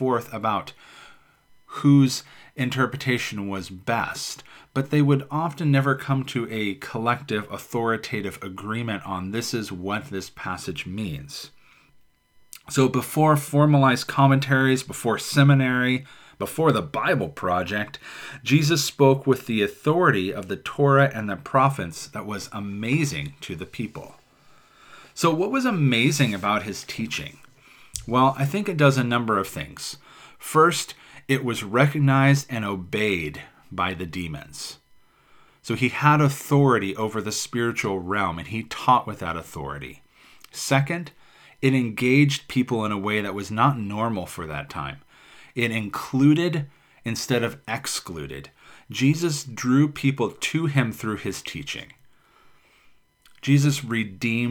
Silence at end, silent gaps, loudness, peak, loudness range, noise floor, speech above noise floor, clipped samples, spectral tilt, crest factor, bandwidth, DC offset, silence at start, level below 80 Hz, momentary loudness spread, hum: 0 s; none; -23 LUFS; -2 dBFS; 7 LU; -58 dBFS; 36 dB; under 0.1%; -5.5 dB/octave; 22 dB; 18 kHz; under 0.1%; 0 s; -56 dBFS; 15 LU; none